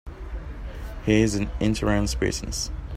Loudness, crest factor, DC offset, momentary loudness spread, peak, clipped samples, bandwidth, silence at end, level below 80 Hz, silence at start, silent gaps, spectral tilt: -24 LUFS; 20 dB; under 0.1%; 16 LU; -6 dBFS; under 0.1%; 15 kHz; 0 s; -34 dBFS; 0.05 s; none; -5 dB/octave